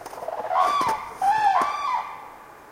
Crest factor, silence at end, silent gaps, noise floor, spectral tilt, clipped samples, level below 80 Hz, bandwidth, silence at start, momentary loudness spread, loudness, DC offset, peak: 16 dB; 0 s; none; -44 dBFS; -2.5 dB/octave; under 0.1%; -60 dBFS; 16 kHz; 0 s; 16 LU; -23 LUFS; under 0.1%; -8 dBFS